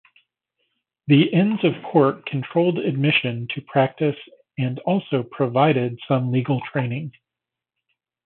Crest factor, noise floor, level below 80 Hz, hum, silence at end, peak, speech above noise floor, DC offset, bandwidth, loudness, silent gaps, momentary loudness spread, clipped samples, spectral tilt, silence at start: 18 dB; -86 dBFS; -68 dBFS; none; 1.15 s; -4 dBFS; 66 dB; under 0.1%; 4.3 kHz; -21 LUFS; none; 10 LU; under 0.1%; -11.5 dB/octave; 1.05 s